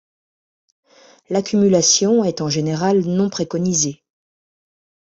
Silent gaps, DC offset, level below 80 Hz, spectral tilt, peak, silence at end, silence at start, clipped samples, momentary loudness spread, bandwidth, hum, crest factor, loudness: none; under 0.1%; -58 dBFS; -4.5 dB/octave; -2 dBFS; 1.1 s; 1.3 s; under 0.1%; 8 LU; 8.2 kHz; none; 16 dB; -17 LUFS